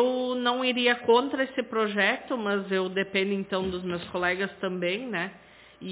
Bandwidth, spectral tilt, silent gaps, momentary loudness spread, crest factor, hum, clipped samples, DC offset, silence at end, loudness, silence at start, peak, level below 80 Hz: 4 kHz; -8.5 dB/octave; none; 8 LU; 20 dB; none; under 0.1%; under 0.1%; 0 s; -27 LUFS; 0 s; -8 dBFS; -62 dBFS